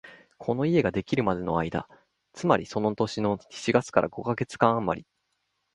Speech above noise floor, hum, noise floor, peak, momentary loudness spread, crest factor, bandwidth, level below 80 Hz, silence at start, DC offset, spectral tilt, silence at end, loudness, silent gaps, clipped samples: 51 dB; none; -77 dBFS; -4 dBFS; 8 LU; 24 dB; 11.5 kHz; -56 dBFS; 0.05 s; under 0.1%; -6.5 dB/octave; 0.75 s; -27 LUFS; none; under 0.1%